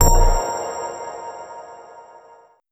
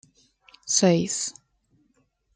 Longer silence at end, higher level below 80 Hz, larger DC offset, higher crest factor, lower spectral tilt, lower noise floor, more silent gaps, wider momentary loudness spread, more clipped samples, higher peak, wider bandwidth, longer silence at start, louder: second, 0.7 s vs 1.05 s; first, -22 dBFS vs -66 dBFS; neither; about the same, 18 dB vs 22 dB; about the same, -4 dB/octave vs -4 dB/octave; second, -50 dBFS vs -68 dBFS; neither; first, 24 LU vs 14 LU; neither; first, -2 dBFS vs -6 dBFS; first, 15 kHz vs 9.6 kHz; second, 0 s vs 0.65 s; about the same, -23 LUFS vs -23 LUFS